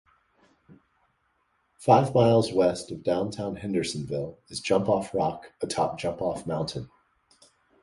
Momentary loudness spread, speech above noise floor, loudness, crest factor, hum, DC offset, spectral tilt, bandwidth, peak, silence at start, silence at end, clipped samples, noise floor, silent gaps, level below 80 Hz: 13 LU; 46 dB; -26 LUFS; 22 dB; none; under 0.1%; -6 dB/octave; 11.5 kHz; -4 dBFS; 1.8 s; 0.95 s; under 0.1%; -71 dBFS; none; -58 dBFS